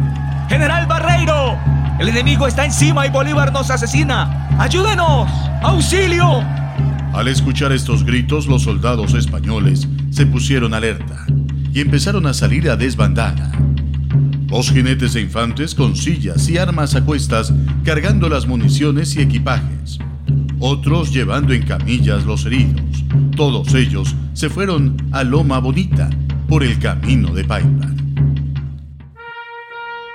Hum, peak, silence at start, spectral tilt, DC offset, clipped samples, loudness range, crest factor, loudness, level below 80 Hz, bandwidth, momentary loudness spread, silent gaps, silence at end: none; 0 dBFS; 0 s; -6 dB/octave; under 0.1%; under 0.1%; 2 LU; 14 dB; -15 LUFS; -24 dBFS; 12 kHz; 6 LU; none; 0 s